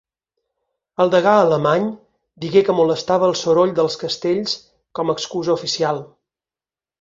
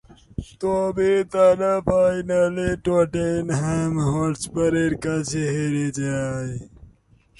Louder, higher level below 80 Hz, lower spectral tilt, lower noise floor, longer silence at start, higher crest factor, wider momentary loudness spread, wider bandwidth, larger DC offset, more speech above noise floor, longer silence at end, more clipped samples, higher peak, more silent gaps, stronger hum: first, -18 LUFS vs -22 LUFS; second, -60 dBFS vs -44 dBFS; second, -5 dB/octave vs -6.5 dB/octave; first, under -90 dBFS vs -55 dBFS; first, 1 s vs 0.4 s; about the same, 18 dB vs 16 dB; about the same, 12 LU vs 10 LU; second, 7.8 kHz vs 11.5 kHz; neither; first, over 73 dB vs 34 dB; first, 0.95 s vs 0.55 s; neither; about the same, -2 dBFS vs -4 dBFS; neither; neither